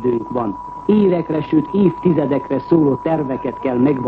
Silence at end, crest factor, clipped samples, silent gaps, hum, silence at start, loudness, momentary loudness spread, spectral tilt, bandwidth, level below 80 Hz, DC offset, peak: 0 s; 14 dB; under 0.1%; none; none; 0 s; -17 LUFS; 8 LU; -10.5 dB/octave; 5.2 kHz; -48 dBFS; under 0.1%; -2 dBFS